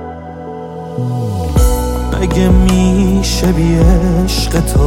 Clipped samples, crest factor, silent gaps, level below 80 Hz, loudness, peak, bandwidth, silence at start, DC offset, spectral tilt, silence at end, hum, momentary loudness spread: under 0.1%; 10 dB; none; -16 dBFS; -13 LUFS; 0 dBFS; 17 kHz; 0 s; under 0.1%; -6 dB/octave; 0 s; none; 15 LU